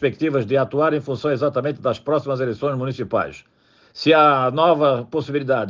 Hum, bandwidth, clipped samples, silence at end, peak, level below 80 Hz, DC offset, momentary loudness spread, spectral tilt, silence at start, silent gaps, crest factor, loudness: none; 7.4 kHz; under 0.1%; 0 s; -4 dBFS; -62 dBFS; under 0.1%; 9 LU; -7.5 dB/octave; 0 s; none; 16 dB; -20 LUFS